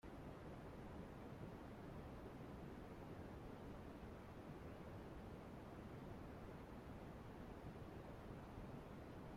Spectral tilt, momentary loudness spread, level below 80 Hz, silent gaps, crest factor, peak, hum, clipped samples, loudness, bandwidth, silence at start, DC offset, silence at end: -7.5 dB/octave; 1 LU; -64 dBFS; none; 14 dB; -42 dBFS; none; under 0.1%; -56 LUFS; 16 kHz; 0.05 s; under 0.1%; 0 s